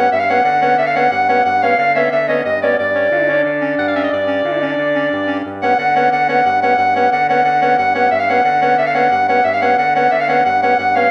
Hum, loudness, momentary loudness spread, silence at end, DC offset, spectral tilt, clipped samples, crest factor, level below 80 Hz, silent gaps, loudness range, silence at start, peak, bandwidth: none; -14 LUFS; 4 LU; 0 s; under 0.1%; -6 dB/octave; under 0.1%; 12 dB; -66 dBFS; none; 2 LU; 0 s; -2 dBFS; 7 kHz